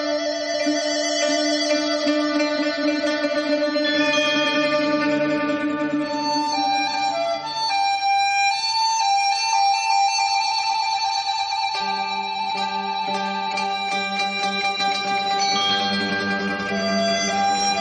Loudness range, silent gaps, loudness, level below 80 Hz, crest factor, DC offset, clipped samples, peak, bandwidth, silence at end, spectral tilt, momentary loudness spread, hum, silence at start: 4 LU; none; -21 LUFS; -64 dBFS; 16 dB; under 0.1%; under 0.1%; -6 dBFS; 10.5 kHz; 0 s; -2.5 dB/octave; 5 LU; none; 0 s